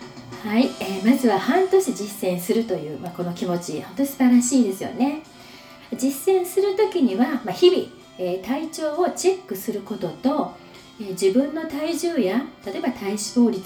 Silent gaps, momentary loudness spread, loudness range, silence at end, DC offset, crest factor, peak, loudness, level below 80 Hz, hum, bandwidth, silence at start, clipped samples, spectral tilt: none; 13 LU; 3 LU; 0 s; under 0.1%; 18 dB; -4 dBFS; -22 LUFS; -62 dBFS; none; over 20 kHz; 0 s; under 0.1%; -4.5 dB/octave